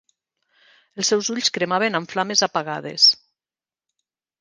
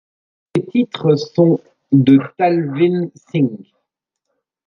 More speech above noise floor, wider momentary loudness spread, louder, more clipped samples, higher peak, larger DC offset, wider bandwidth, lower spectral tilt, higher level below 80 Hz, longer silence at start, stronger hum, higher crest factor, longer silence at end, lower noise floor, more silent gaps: first, over 69 dB vs 62 dB; about the same, 11 LU vs 10 LU; second, -19 LUFS vs -16 LUFS; neither; about the same, -2 dBFS vs -2 dBFS; neither; first, 10.5 kHz vs 6.8 kHz; second, -2 dB/octave vs -8.5 dB/octave; second, -72 dBFS vs -62 dBFS; first, 0.95 s vs 0.55 s; neither; first, 22 dB vs 16 dB; first, 1.25 s vs 1.05 s; first, under -90 dBFS vs -77 dBFS; neither